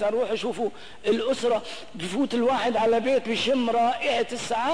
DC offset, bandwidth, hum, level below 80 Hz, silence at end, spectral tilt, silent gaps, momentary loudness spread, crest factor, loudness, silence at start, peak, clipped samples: 0.8%; 10.5 kHz; none; -60 dBFS; 0 s; -4 dB/octave; none; 9 LU; 12 dB; -25 LUFS; 0 s; -12 dBFS; under 0.1%